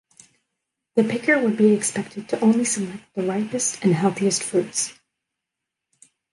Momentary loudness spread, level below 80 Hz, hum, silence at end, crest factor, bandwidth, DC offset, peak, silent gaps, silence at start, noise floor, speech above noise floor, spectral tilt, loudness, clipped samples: 10 LU; -68 dBFS; none; 1.4 s; 18 dB; 11.5 kHz; under 0.1%; -6 dBFS; none; 0.95 s; -84 dBFS; 63 dB; -4.5 dB/octave; -22 LUFS; under 0.1%